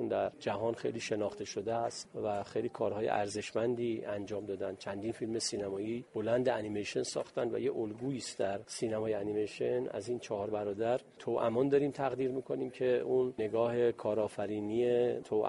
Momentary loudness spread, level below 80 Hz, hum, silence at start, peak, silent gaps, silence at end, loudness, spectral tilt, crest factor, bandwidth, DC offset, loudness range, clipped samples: 8 LU; -70 dBFS; none; 0 s; -16 dBFS; none; 0 s; -35 LUFS; -5 dB/octave; 18 dB; 11.5 kHz; under 0.1%; 3 LU; under 0.1%